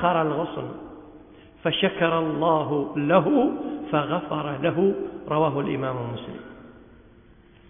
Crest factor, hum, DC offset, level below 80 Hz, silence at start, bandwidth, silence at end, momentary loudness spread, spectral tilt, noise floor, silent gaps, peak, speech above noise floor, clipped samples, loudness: 20 dB; none; under 0.1%; -56 dBFS; 0 s; 3.7 kHz; 0.95 s; 15 LU; -10.5 dB/octave; -52 dBFS; none; -6 dBFS; 29 dB; under 0.1%; -24 LUFS